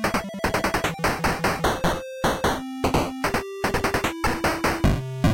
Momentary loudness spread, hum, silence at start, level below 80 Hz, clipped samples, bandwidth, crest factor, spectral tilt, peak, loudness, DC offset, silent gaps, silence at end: 3 LU; none; 0 s; -36 dBFS; under 0.1%; 17 kHz; 12 dB; -5 dB/octave; -12 dBFS; -24 LUFS; under 0.1%; none; 0 s